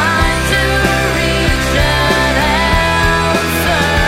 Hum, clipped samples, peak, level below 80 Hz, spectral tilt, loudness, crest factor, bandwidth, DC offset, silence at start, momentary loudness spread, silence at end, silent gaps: none; under 0.1%; 0 dBFS; -20 dBFS; -4 dB/octave; -12 LUFS; 12 dB; 16.5 kHz; under 0.1%; 0 s; 2 LU; 0 s; none